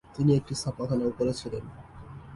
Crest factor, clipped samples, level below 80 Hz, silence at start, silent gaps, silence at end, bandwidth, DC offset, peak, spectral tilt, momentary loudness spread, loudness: 16 dB; under 0.1%; -52 dBFS; 0.1 s; none; 0 s; 11.5 kHz; under 0.1%; -12 dBFS; -7 dB/octave; 21 LU; -29 LUFS